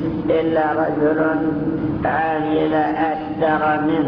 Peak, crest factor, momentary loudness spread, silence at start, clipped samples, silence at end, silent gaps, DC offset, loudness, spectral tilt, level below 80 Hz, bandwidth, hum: -6 dBFS; 12 dB; 4 LU; 0 s; under 0.1%; 0 s; none; under 0.1%; -19 LUFS; -10 dB/octave; -44 dBFS; 5.4 kHz; none